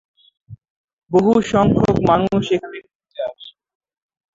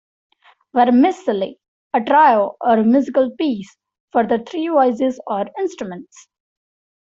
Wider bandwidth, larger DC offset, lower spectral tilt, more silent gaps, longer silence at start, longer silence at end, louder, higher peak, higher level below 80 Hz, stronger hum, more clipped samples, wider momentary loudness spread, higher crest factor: about the same, 7.8 kHz vs 7.6 kHz; neither; about the same, -7.5 dB/octave vs -6.5 dB/octave; about the same, 0.70-0.97 s, 2.95-3.00 s vs 1.68-1.90 s, 4.00-4.08 s; second, 0.5 s vs 0.75 s; second, 0.85 s vs 1 s; about the same, -17 LUFS vs -17 LUFS; about the same, -2 dBFS vs -2 dBFS; first, -44 dBFS vs -64 dBFS; neither; neither; first, 17 LU vs 12 LU; about the same, 18 dB vs 16 dB